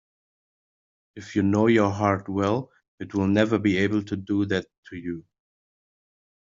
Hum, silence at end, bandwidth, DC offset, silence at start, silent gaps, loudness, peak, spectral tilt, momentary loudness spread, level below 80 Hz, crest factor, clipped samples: none; 1.3 s; 7.6 kHz; under 0.1%; 1.15 s; 2.88-2.98 s, 4.78-4.83 s; -24 LUFS; -6 dBFS; -6 dB/octave; 18 LU; -64 dBFS; 20 dB; under 0.1%